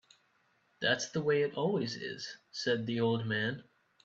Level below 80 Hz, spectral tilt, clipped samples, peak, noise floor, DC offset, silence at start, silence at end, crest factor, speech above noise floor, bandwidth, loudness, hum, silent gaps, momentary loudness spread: -76 dBFS; -4.5 dB/octave; under 0.1%; -14 dBFS; -72 dBFS; under 0.1%; 0.8 s; 0.4 s; 20 dB; 39 dB; 8 kHz; -33 LUFS; none; none; 10 LU